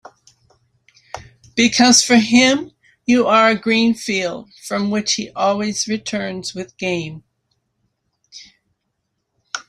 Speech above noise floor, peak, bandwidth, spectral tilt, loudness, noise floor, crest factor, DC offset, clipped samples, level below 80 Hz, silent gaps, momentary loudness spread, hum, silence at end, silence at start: 57 dB; 0 dBFS; 13 kHz; -3 dB/octave; -16 LUFS; -73 dBFS; 18 dB; under 0.1%; under 0.1%; -58 dBFS; none; 20 LU; none; 0.05 s; 1.15 s